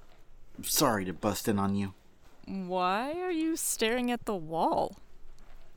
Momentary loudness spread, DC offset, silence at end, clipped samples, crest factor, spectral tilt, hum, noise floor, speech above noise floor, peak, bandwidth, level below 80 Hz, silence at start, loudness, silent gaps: 10 LU; under 0.1%; 0 s; under 0.1%; 20 dB; -4 dB/octave; none; -51 dBFS; 21 dB; -12 dBFS; over 20 kHz; -54 dBFS; 0 s; -31 LUFS; none